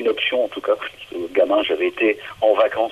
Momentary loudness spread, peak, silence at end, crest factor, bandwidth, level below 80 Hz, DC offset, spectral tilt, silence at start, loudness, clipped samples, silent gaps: 7 LU; -4 dBFS; 0 s; 16 dB; 13 kHz; -60 dBFS; under 0.1%; -4.5 dB/octave; 0 s; -20 LUFS; under 0.1%; none